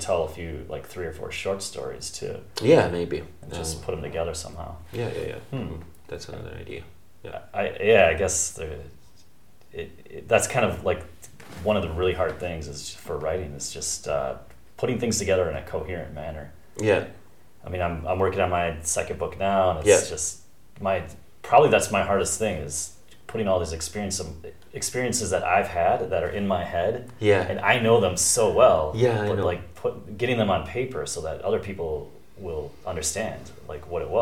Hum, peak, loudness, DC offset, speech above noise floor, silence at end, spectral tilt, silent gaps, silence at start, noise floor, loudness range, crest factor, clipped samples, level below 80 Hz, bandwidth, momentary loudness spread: none; -4 dBFS; -25 LUFS; 0.5%; 33 dB; 0 s; -4 dB/octave; none; 0 s; -58 dBFS; 8 LU; 22 dB; under 0.1%; -46 dBFS; 16.5 kHz; 19 LU